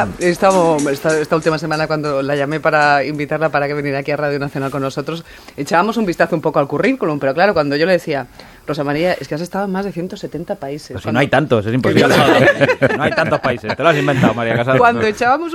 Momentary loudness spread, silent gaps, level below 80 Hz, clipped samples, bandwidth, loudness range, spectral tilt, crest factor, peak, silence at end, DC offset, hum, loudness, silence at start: 13 LU; none; -48 dBFS; under 0.1%; 16.5 kHz; 5 LU; -5.5 dB/octave; 16 dB; 0 dBFS; 0 s; under 0.1%; none; -16 LUFS; 0 s